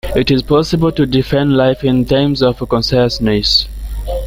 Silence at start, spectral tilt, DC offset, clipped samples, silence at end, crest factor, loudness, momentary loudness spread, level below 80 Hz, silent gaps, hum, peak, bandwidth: 0.05 s; -6 dB/octave; under 0.1%; under 0.1%; 0 s; 14 dB; -13 LUFS; 3 LU; -28 dBFS; none; none; 0 dBFS; 16 kHz